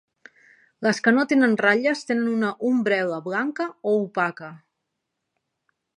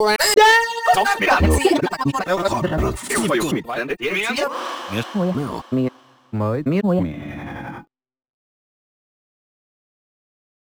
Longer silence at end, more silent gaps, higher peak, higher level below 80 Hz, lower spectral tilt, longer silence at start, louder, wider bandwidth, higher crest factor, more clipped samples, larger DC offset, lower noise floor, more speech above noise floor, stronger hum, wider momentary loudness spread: second, 1.4 s vs 2.85 s; neither; about the same, -4 dBFS vs -2 dBFS; second, -76 dBFS vs -36 dBFS; about the same, -5.5 dB/octave vs -4.5 dB/octave; first, 0.8 s vs 0 s; second, -22 LUFS vs -19 LUFS; second, 11 kHz vs over 20 kHz; about the same, 20 dB vs 18 dB; neither; neither; first, -80 dBFS vs -41 dBFS; first, 58 dB vs 21 dB; neither; second, 9 LU vs 15 LU